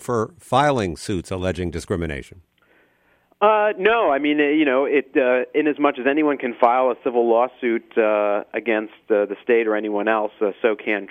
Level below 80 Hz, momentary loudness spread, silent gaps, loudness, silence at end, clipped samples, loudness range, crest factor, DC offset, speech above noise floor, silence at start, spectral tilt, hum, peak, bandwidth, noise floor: -50 dBFS; 8 LU; none; -20 LUFS; 0 s; under 0.1%; 5 LU; 20 dB; under 0.1%; 41 dB; 0 s; -6 dB/octave; none; 0 dBFS; 12.5 kHz; -61 dBFS